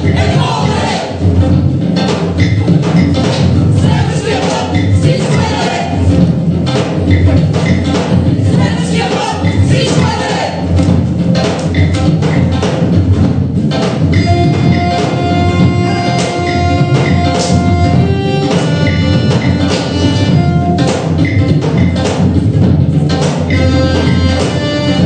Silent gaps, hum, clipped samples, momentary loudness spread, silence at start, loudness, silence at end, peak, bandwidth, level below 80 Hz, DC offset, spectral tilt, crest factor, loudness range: none; none; 0.2%; 3 LU; 0 s; -11 LUFS; 0 s; 0 dBFS; 9.4 kHz; -28 dBFS; under 0.1%; -6.5 dB/octave; 10 dB; 1 LU